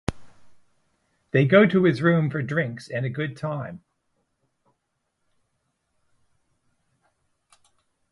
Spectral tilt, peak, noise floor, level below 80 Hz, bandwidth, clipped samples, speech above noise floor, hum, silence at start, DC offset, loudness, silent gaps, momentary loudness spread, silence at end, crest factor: -8 dB/octave; -2 dBFS; -76 dBFS; -54 dBFS; 11.5 kHz; under 0.1%; 55 dB; none; 0.1 s; under 0.1%; -22 LUFS; none; 15 LU; 4.35 s; 24 dB